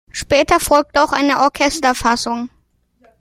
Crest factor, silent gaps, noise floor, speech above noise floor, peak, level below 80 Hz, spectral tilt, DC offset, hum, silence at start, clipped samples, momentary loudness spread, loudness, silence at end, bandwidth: 16 dB; none; -59 dBFS; 44 dB; 0 dBFS; -40 dBFS; -3 dB/octave; under 0.1%; none; 0.15 s; under 0.1%; 8 LU; -15 LUFS; 0.75 s; 16 kHz